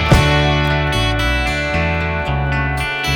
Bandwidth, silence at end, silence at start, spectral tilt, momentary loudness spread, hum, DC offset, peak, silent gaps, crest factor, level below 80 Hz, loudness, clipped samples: 19.5 kHz; 0 s; 0 s; -5.5 dB/octave; 6 LU; none; under 0.1%; 0 dBFS; none; 16 dB; -22 dBFS; -16 LUFS; under 0.1%